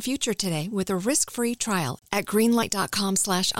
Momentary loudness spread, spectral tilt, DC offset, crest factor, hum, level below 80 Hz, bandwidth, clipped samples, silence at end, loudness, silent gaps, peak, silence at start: 6 LU; -3.5 dB/octave; 0.3%; 16 dB; none; -56 dBFS; 17 kHz; under 0.1%; 0 s; -24 LUFS; none; -8 dBFS; 0 s